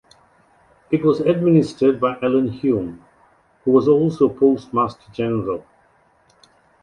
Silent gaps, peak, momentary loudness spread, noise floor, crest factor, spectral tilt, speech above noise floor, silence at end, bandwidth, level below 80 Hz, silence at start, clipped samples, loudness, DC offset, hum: none; -2 dBFS; 10 LU; -57 dBFS; 16 dB; -8.5 dB/octave; 40 dB; 1.25 s; 10 kHz; -56 dBFS; 0.9 s; under 0.1%; -19 LUFS; under 0.1%; none